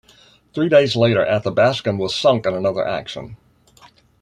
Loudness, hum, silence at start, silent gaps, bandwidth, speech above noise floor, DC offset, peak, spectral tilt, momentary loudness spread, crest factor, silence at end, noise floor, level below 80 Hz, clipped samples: -18 LUFS; none; 0.55 s; none; 10.5 kHz; 34 dB; under 0.1%; -2 dBFS; -6 dB/octave; 17 LU; 18 dB; 0.85 s; -51 dBFS; -54 dBFS; under 0.1%